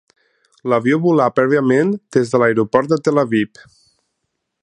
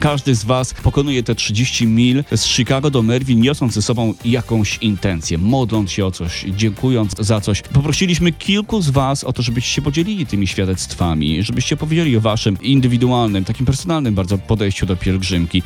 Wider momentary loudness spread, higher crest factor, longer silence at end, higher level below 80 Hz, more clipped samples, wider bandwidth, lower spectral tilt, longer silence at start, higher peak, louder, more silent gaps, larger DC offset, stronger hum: about the same, 5 LU vs 5 LU; about the same, 16 dB vs 14 dB; first, 1.15 s vs 0 s; second, -62 dBFS vs -34 dBFS; neither; second, 10.5 kHz vs 15 kHz; first, -7 dB/octave vs -5.5 dB/octave; first, 0.65 s vs 0 s; about the same, 0 dBFS vs -2 dBFS; about the same, -16 LUFS vs -17 LUFS; neither; neither; neither